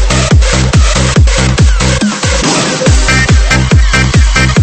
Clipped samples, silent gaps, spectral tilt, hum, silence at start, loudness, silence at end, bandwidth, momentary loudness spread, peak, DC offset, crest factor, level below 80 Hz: 0.3%; none; -4.5 dB/octave; none; 0 s; -8 LUFS; 0 s; 8.8 kHz; 2 LU; 0 dBFS; under 0.1%; 8 dB; -10 dBFS